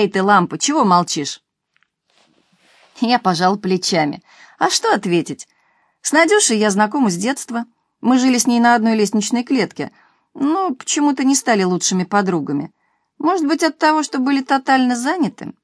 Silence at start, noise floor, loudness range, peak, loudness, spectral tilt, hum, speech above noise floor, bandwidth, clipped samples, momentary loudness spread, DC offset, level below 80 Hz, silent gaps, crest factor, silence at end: 0 s; -65 dBFS; 3 LU; 0 dBFS; -16 LUFS; -3.5 dB/octave; none; 49 dB; 11 kHz; under 0.1%; 10 LU; under 0.1%; -70 dBFS; none; 18 dB; 0.15 s